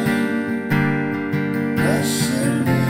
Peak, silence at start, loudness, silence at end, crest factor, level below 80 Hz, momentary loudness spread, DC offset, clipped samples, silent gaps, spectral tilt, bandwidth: -6 dBFS; 0 s; -20 LUFS; 0 s; 14 dB; -52 dBFS; 4 LU; under 0.1%; under 0.1%; none; -5.5 dB/octave; 16 kHz